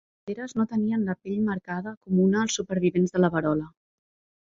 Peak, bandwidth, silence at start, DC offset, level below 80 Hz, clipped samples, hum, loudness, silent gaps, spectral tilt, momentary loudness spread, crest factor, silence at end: -8 dBFS; 7.8 kHz; 0.25 s; under 0.1%; -62 dBFS; under 0.1%; none; -26 LUFS; 1.97-2.01 s; -6 dB/octave; 11 LU; 18 dB; 0.8 s